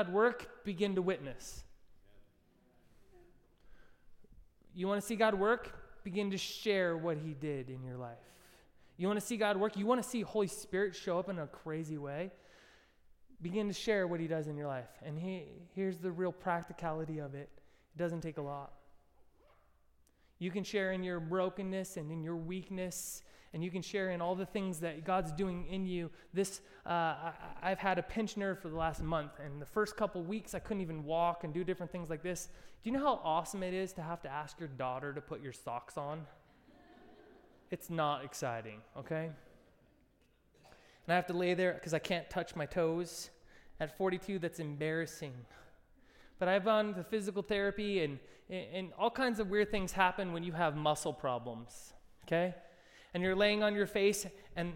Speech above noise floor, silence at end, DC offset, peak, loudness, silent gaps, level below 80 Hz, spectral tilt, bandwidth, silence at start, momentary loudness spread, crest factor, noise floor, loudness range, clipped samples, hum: 34 dB; 0 s; under 0.1%; -14 dBFS; -37 LUFS; none; -60 dBFS; -5 dB/octave; 16.5 kHz; 0 s; 14 LU; 24 dB; -70 dBFS; 7 LU; under 0.1%; none